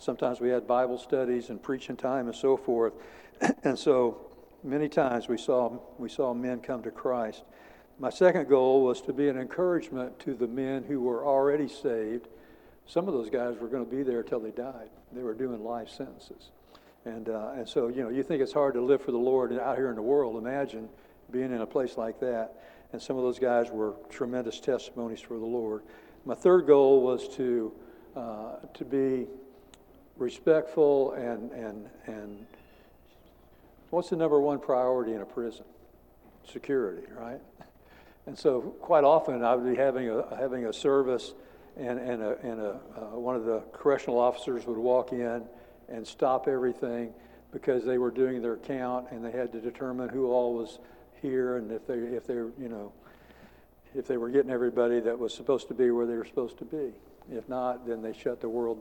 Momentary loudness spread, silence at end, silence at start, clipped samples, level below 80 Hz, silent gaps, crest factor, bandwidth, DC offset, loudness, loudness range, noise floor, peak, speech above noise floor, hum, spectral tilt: 16 LU; 0 s; 0 s; under 0.1%; -64 dBFS; none; 22 dB; 18 kHz; under 0.1%; -29 LUFS; 7 LU; -57 dBFS; -8 dBFS; 29 dB; none; -6.5 dB/octave